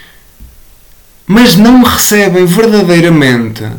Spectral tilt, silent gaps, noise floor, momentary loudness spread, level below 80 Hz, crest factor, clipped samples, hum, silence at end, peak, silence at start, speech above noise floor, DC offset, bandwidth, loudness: -4.5 dB/octave; none; -39 dBFS; 5 LU; -34 dBFS; 8 dB; 0.1%; none; 0 s; 0 dBFS; 0.4 s; 33 dB; 0.8%; 19.5 kHz; -6 LUFS